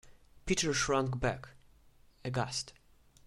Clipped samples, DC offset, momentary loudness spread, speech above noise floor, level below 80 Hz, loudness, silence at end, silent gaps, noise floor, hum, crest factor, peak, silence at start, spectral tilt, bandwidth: under 0.1%; under 0.1%; 17 LU; 29 dB; -54 dBFS; -34 LUFS; 0.55 s; none; -62 dBFS; none; 20 dB; -16 dBFS; 0.05 s; -4 dB/octave; 14 kHz